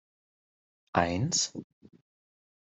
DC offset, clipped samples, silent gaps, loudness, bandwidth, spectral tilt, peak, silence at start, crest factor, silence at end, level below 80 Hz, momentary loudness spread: under 0.1%; under 0.1%; none; -29 LUFS; 8.2 kHz; -3.5 dB/octave; -10 dBFS; 0.95 s; 26 dB; 1.1 s; -66 dBFS; 7 LU